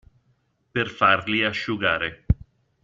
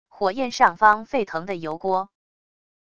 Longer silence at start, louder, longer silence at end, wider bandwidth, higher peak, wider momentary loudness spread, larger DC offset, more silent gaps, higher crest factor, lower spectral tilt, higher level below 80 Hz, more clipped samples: first, 0.75 s vs 0.15 s; about the same, -23 LUFS vs -22 LUFS; second, 0.5 s vs 0.75 s; second, 7.6 kHz vs 10 kHz; about the same, -4 dBFS vs -2 dBFS; second, 8 LU vs 12 LU; second, under 0.1% vs 0.5%; neither; about the same, 22 dB vs 22 dB; first, -6 dB/octave vs -4 dB/octave; first, -38 dBFS vs -60 dBFS; neither